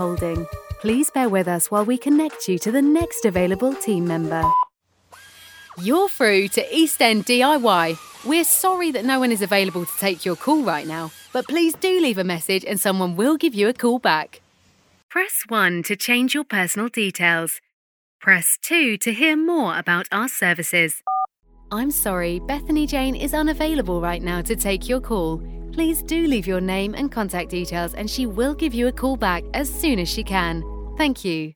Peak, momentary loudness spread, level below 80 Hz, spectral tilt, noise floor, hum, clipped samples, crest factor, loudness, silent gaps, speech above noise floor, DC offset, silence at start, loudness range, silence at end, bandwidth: 0 dBFS; 9 LU; -38 dBFS; -3.5 dB/octave; -58 dBFS; none; under 0.1%; 20 dB; -20 LUFS; 15.03-15.09 s, 17.73-18.19 s; 38 dB; under 0.1%; 0 s; 5 LU; 0.05 s; over 20 kHz